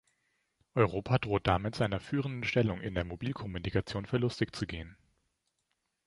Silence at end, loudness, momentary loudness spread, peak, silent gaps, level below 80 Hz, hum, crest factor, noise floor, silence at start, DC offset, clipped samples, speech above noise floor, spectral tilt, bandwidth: 1.15 s; -33 LUFS; 8 LU; -10 dBFS; none; -50 dBFS; none; 24 dB; -81 dBFS; 0.75 s; under 0.1%; under 0.1%; 49 dB; -7 dB/octave; 11.5 kHz